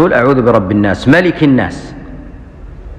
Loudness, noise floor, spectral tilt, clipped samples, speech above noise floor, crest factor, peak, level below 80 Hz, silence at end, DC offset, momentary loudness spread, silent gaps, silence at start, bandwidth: -10 LUFS; -30 dBFS; -7.5 dB/octave; under 0.1%; 21 dB; 12 dB; 0 dBFS; -32 dBFS; 0 s; under 0.1%; 21 LU; none; 0 s; 9.4 kHz